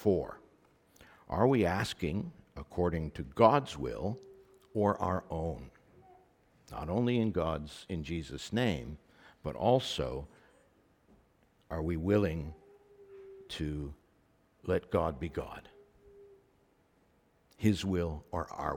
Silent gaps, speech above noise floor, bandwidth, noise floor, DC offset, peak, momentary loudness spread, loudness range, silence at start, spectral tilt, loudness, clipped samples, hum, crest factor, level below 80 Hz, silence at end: none; 37 dB; 17 kHz; -69 dBFS; under 0.1%; -8 dBFS; 18 LU; 7 LU; 0 s; -6.5 dB/octave; -33 LUFS; under 0.1%; none; 26 dB; -52 dBFS; 0 s